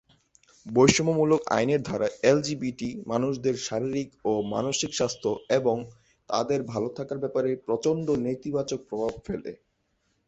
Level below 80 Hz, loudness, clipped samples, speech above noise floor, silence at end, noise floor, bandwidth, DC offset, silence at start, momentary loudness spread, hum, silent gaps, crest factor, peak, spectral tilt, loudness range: -58 dBFS; -27 LUFS; under 0.1%; 47 dB; 0.75 s; -73 dBFS; 8.4 kHz; under 0.1%; 0.65 s; 9 LU; none; none; 24 dB; -4 dBFS; -5 dB/octave; 4 LU